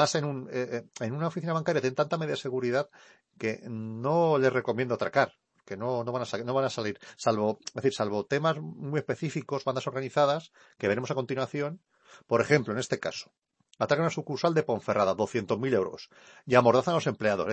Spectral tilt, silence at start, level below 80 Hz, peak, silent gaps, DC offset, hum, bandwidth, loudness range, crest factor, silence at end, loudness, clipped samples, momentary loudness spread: -5.5 dB/octave; 0 s; -72 dBFS; -8 dBFS; none; under 0.1%; none; 8.8 kHz; 4 LU; 22 dB; 0 s; -29 LUFS; under 0.1%; 10 LU